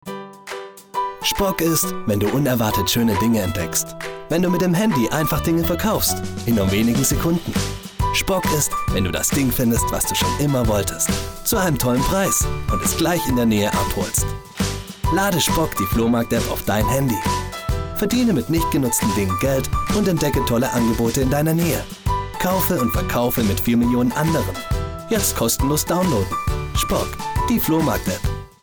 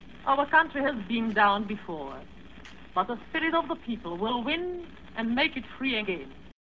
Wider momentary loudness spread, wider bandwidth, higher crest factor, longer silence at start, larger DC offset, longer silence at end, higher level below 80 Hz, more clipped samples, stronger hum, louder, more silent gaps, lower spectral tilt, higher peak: second, 7 LU vs 17 LU; first, over 20 kHz vs 7.2 kHz; about the same, 16 dB vs 20 dB; about the same, 0.05 s vs 0 s; second, under 0.1% vs 0.3%; about the same, 0.15 s vs 0.15 s; first, -32 dBFS vs -54 dBFS; neither; neither; first, -20 LUFS vs -28 LUFS; neither; second, -4.5 dB/octave vs -6.5 dB/octave; first, -4 dBFS vs -8 dBFS